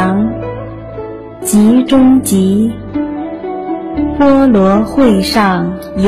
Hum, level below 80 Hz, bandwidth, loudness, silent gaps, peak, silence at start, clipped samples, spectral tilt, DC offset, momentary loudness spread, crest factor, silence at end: none; -34 dBFS; 15 kHz; -11 LUFS; none; 0 dBFS; 0 s; under 0.1%; -6 dB/octave; under 0.1%; 16 LU; 10 dB; 0 s